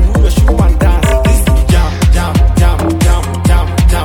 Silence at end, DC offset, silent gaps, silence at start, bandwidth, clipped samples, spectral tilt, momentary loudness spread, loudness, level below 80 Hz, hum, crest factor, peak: 0 s; under 0.1%; none; 0 s; 16.5 kHz; under 0.1%; -6 dB/octave; 2 LU; -11 LUFS; -10 dBFS; none; 8 dB; 0 dBFS